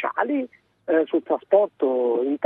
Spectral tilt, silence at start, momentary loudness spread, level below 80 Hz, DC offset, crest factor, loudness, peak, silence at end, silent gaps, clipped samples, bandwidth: -8.5 dB/octave; 0 s; 8 LU; -80 dBFS; under 0.1%; 18 dB; -22 LUFS; -4 dBFS; 0 s; none; under 0.1%; 3.9 kHz